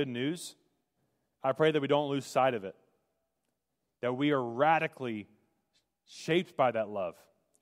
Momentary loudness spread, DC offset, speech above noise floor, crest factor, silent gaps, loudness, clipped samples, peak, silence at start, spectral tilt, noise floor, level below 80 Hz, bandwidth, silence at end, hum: 13 LU; under 0.1%; 54 dB; 20 dB; none; -31 LUFS; under 0.1%; -12 dBFS; 0 s; -5.5 dB/octave; -84 dBFS; -82 dBFS; 16 kHz; 0.5 s; none